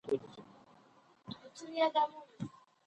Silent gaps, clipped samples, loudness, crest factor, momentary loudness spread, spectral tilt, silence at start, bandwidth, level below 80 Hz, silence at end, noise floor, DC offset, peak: none; under 0.1%; -36 LUFS; 20 dB; 23 LU; -5 dB/octave; 0.05 s; 9.4 kHz; -78 dBFS; 0.4 s; -65 dBFS; under 0.1%; -20 dBFS